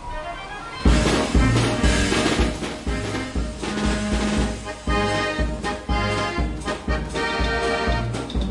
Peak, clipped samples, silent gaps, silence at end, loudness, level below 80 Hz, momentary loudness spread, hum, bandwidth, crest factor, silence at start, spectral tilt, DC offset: -6 dBFS; under 0.1%; none; 0 s; -23 LUFS; -28 dBFS; 9 LU; none; 11.5 kHz; 16 dB; 0 s; -5 dB/octave; under 0.1%